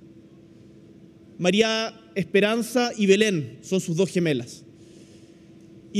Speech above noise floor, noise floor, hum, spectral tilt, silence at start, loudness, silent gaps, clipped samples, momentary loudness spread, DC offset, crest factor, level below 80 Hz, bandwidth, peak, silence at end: 27 dB; -49 dBFS; none; -5 dB/octave; 1.4 s; -23 LUFS; none; under 0.1%; 10 LU; under 0.1%; 20 dB; -66 dBFS; 15 kHz; -4 dBFS; 0 s